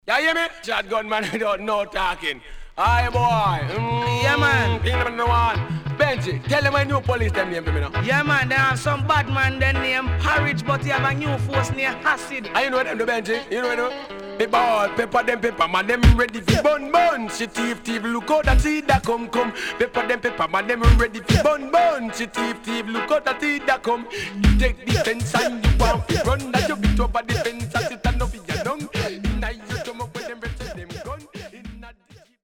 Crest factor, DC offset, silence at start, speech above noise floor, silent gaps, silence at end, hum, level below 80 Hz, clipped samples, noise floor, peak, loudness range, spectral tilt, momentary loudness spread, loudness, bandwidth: 18 dB; under 0.1%; 0.05 s; 31 dB; none; 0.25 s; none; -30 dBFS; under 0.1%; -51 dBFS; -2 dBFS; 4 LU; -5.5 dB/octave; 9 LU; -21 LUFS; 17 kHz